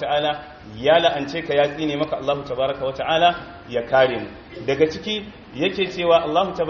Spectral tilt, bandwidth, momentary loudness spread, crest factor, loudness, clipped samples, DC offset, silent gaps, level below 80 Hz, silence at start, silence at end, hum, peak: -2.5 dB/octave; 6.8 kHz; 12 LU; 18 dB; -21 LUFS; under 0.1%; under 0.1%; none; -50 dBFS; 0 s; 0 s; none; -4 dBFS